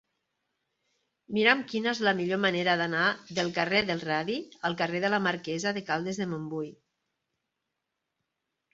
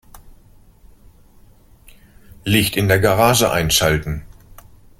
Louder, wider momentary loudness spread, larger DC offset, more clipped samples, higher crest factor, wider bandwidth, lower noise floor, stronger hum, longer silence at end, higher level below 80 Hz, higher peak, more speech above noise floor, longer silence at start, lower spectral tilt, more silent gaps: second, -28 LUFS vs -16 LUFS; second, 9 LU vs 15 LU; neither; neither; about the same, 24 dB vs 20 dB; second, 8 kHz vs 17 kHz; first, -84 dBFS vs -48 dBFS; neither; first, 2 s vs 0.75 s; second, -70 dBFS vs -38 dBFS; second, -6 dBFS vs 0 dBFS; first, 56 dB vs 32 dB; first, 1.3 s vs 0.15 s; about the same, -4.5 dB/octave vs -4 dB/octave; neither